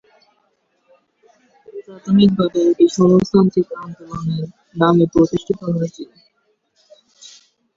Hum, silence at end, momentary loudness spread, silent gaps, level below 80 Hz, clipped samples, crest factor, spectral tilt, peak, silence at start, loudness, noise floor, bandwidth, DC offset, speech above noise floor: none; 1.7 s; 21 LU; none; -50 dBFS; under 0.1%; 16 dB; -7.5 dB/octave; -2 dBFS; 1.75 s; -16 LUFS; -65 dBFS; 7.6 kHz; under 0.1%; 50 dB